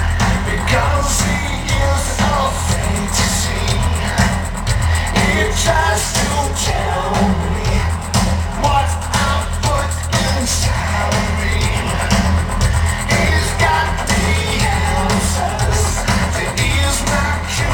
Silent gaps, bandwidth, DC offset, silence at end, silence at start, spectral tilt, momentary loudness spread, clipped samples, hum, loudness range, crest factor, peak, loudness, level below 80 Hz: none; 19 kHz; under 0.1%; 0 s; 0 s; -4 dB/octave; 3 LU; under 0.1%; none; 1 LU; 16 dB; 0 dBFS; -16 LUFS; -22 dBFS